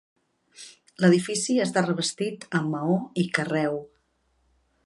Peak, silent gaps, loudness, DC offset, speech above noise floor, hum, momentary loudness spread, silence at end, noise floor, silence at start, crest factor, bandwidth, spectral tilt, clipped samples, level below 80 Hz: -6 dBFS; none; -25 LUFS; under 0.1%; 45 dB; none; 20 LU; 1 s; -69 dBFS; 0.6 s; 20 dB; 11.5 kHz; -5 dB/octave; under 0.1%; -70 dBFS